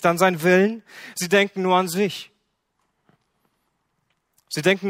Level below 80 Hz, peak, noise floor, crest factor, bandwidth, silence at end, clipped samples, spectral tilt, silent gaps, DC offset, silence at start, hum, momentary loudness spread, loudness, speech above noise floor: -68 dBFS; -2 dBFS; -73 dBFS; 20 dB; 16 kHz; 0 s; under 0.1%; -4.5 dB/octave; none; under 0.1%; 0 s; none; 16 LU; -20 LUFS; 52 dB